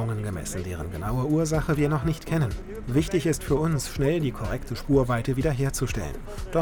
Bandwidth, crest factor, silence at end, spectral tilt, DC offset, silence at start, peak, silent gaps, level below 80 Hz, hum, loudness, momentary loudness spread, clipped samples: 19.5 kHz; 16 dB; 0 s; -6.5 dB/octave; under 0.1%; 0 s; -8 dBFS; none; -36 dBFS; none; -26 LUFS; 9 LU; under 0.1%